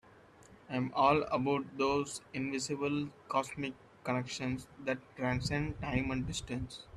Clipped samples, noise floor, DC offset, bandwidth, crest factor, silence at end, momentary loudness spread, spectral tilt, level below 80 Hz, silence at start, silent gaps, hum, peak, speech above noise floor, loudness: under 0.1%; -59 dBFS; under 0.1%; 12.5 kHz; 20 dB; 0 s; 10 LU; -5 dB/octave; -56 dBFS; 0.45 s; none; none; -16 dBFS; 25 dB; -35 LUFS